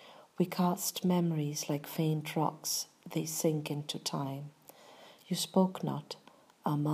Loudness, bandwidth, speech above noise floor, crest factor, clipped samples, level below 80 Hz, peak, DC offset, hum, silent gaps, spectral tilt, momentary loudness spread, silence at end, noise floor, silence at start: -34 LUFS; 15.5 kHz; 23 dB; 18 dB; under 0.1%; -84 dBFS; -16 dBFS; under 0.1%; none; none; -5 dB/octave; 10 LU; 0 s; -56 dBFS; 0 s